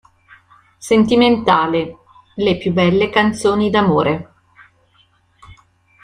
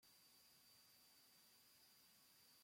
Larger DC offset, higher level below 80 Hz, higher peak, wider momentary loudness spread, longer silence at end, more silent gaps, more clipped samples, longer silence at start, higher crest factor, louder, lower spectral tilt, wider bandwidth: neither; first, -50 dBFS vs under -90 dBFS; first, 0 dBFS vs -58 dBFS; first, 11 LU vs 1 LU; first, 0.5 s vs 0 s; neither; neither; first, 0.8 s vs 0 s; about the same, 16 dB vs 14 dB; first, -15 LUFS vs -69 LUFS; first, -6 dB/octave vs -0.5 dB/octave; second, 12 kHz vs 16.5 kHz